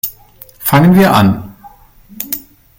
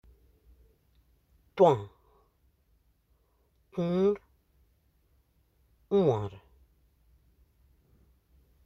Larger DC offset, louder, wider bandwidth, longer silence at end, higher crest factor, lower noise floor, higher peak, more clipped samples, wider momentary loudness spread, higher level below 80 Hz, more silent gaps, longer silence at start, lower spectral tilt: neither; first, -12 LUFS vs -28 LUFS; first, 17 kHz vs 8 kHz; second, 0.4 s vs 2.3 s; second, 14 dB vs 24 dB; second, -40 dBFS vs -70 dBFS; first, 0 dBFS vs -10 dBFS; neither; second, 15 LU vs 18 LU; first, -42 dBFS vs -64 dBFS; neither; second, 0.05 s vs 1.55 s; second, -6 dB/octave vs -8.5 dB/octave